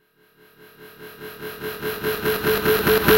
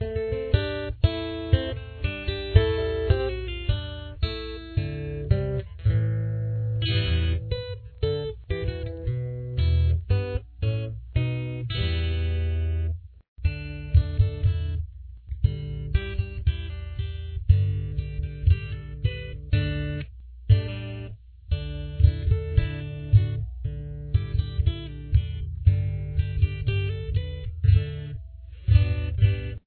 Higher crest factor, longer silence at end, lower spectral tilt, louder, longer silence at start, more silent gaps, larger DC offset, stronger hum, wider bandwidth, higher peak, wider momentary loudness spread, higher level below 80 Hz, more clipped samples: about the same, 22 dB vs 22 dB; about the same, 0 s vs 0.1 s; second, -4 dB/octave vs -10.5 dB/octave; first, -22 LUFS vs -27 LUFS; first, 0.8 s vs 0 s; second, none vs 13.28-13.36 s; neither; neither; first, over 20 kHz vs 4.5 kHz; about the same, -2 dBFS vs -4 dBFS; first, 21 LU vs 12 LU; second, -44 dBFS vs -30 dBFS; neither